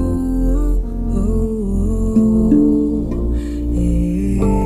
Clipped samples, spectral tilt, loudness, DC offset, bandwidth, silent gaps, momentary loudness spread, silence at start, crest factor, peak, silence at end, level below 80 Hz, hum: under 0.1%; -9.5 dB/octave; -17 LUFS; under 0.1%; 11.5 kHz; none; 8 LU; 0 s; 14 dB; -2 dBFS; 0 s; -20 dBFS; none